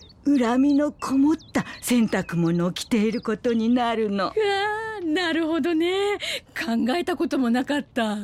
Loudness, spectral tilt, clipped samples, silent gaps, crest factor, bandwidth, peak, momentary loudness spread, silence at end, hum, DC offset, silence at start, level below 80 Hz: -23 LUFS; -5 dB/octave; under 0.1%; none; 12 dB; 15.5 kHz; -12 dBFS; 6 LU; 0 s; none; under 0.1%; 0 s; -56 dBFS